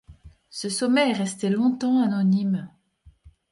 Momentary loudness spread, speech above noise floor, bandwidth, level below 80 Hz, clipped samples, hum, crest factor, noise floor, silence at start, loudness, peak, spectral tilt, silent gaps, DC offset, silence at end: 11 LU; 34 dB; 11.5 kHz; -58 dBFS; under 0.1%; none; 14 dB; -56 dBFS; 0.1 s; -23 LUFS; -10 dBFS; -5.5 dB/octave; none; under 0.1%; 0.2 s